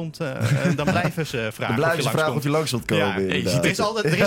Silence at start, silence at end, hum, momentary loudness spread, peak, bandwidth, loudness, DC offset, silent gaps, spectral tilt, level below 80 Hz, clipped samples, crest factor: 0 s; 0 s; none; 5 LU; -6 dBFS; 17 kHz; -22 LUFS; under 0.1%; none; -5.5 dB/octave; -52 dBFS; under 0.1%; 16 dB